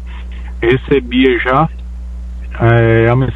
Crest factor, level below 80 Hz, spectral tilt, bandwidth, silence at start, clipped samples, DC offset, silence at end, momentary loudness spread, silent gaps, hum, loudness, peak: 12 dB; -24 dBFS; -9 dB/octave; 4.1 kHz; 0 s; under 0.1%; under 0.1%; 0 s; 18 LU; none; 60 Hz at -25 dBFS; -12 LUFS; 0 dBFS